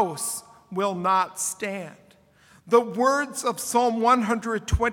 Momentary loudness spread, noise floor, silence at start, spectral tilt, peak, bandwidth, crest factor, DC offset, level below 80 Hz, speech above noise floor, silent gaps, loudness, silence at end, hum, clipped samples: 11 LU; -56 dBFS; 0 s; -4 dB/octave; -4 dBFS; 18 kHz; 20 dB; under 0.1%; -42 dBFS; 33 dB; none; -24 LUFS; 0 s; none; under 0.1%